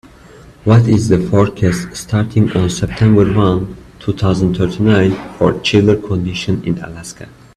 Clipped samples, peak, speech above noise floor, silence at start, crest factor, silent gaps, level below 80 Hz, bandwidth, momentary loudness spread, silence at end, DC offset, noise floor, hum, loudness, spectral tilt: under 0.1%; 0 dBFS; 26 dB; 0.65 s; 14 dB; none; -36 dBFS; 12.5 kHz; 11 LU; 0.25 s; under 0.1%; -40 dBFS; none; -14 LUFS; -7 dB/octave